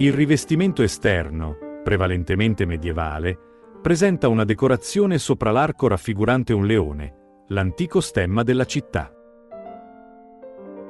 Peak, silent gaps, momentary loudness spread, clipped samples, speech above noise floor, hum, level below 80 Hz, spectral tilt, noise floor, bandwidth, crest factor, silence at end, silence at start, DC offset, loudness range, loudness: -4 dBFS; none; 15 LU; under 0.1%; 26 dB; none; -40 dBFS; -6 dB/octave; -46 dBFS; 12 kHz; 18 dB; 0 s; 0 s; under 0.1%; 5 LU; -21 LUFS